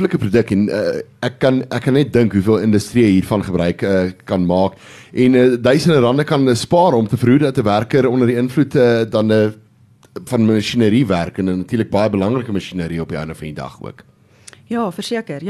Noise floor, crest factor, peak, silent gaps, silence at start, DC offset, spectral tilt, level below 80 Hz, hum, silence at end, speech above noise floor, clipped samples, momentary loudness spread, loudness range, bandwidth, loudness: -50 dBFS; 14 dB; -2 dBFS; none; 0 s; under 0.1%; -7 dB/octave; -42 dBFS; none; 0 s; 34 dB; under 0.1%; 10 LU; 7 LU; 13.5 kHz; -16 LUFS